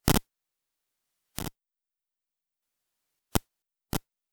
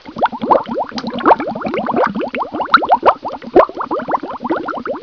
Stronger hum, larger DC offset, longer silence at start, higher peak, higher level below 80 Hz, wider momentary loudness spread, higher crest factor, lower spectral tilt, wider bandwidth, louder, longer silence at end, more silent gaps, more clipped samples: neither; second, under 0.1% vs 0.1%; about the same, 0.05 s vs 0.05 s; about the same, -2 dBFS vs 0 dBFS; about the same, -44 dBFS vs -48 dBFS; first, 12 LU vs 9 LU; first, 34 dB vs 16 dB; second, -4 dB/octave vs -6.5 dB/octave; first, 18.5 kHz vs 5.4 kHz; second, -33 LUFS vs -16 LUFS; first, 0.35 s vs 0 s; neither; second, under 0.1% vs 0.2%